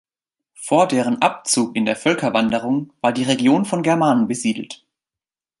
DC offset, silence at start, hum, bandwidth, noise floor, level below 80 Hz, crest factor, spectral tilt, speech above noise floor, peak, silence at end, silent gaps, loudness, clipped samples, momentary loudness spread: under 0.1%; 0.6 s; none; 11.5 kHz; under -90 dBFS; -62 dBFS; 18 dB; -4.5 dB/octave; over 72 dB; -2 dBFS; 0.85 s; none; -19 LUFS; under 0.1%; 7 LU